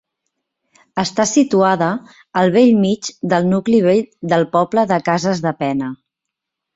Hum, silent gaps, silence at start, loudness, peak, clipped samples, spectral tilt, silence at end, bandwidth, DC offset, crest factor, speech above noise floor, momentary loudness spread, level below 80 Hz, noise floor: none; none; 0.95 s; -16 LUFS; -2 dBFS; under 0.1%; -5.5 dB/octave; 0.8 s; 8 kHz; under 0.1%; 16 dB; 66 dB; 10 LU; -58 dBFS; -81 dBFS